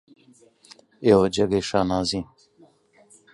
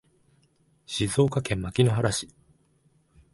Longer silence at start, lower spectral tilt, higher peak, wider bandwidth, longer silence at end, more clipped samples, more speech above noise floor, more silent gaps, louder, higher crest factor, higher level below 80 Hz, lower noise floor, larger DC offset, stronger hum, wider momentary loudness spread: about the same, 1 s vs 0.9 s; about the same, -5.5 dB/octave vs -5.5 dB/octave; first, -4 dBFS vs -8 dBFS; about the same, 11.5 kHz vs 11.5 kHz; about the same, 1.1 s vs 1.05 s; neither; second, 36 dB vs 41 dB; neither; first, -22 LUFS vs -26 LUFS; about the same, 22 dB vs 20 dB; about the same, -50 dBFS vs -50 dBFS; second, -57 dBFS vs -65 dBFS; neither; neither; about the same, 11 LU vs 10 LU